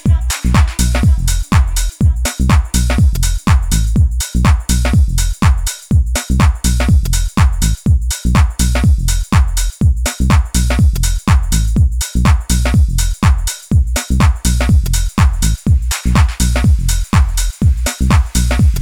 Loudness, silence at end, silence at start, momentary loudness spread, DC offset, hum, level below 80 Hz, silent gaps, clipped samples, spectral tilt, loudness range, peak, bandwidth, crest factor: -14 LUFS; 0 s; 0.05 s; 3 LU; under 0.1%; none; -14 dBFS; none; under 0.1%; -5 dB/octave; 0 LU; 0 dBFS; 17.5 kHz; 12 dB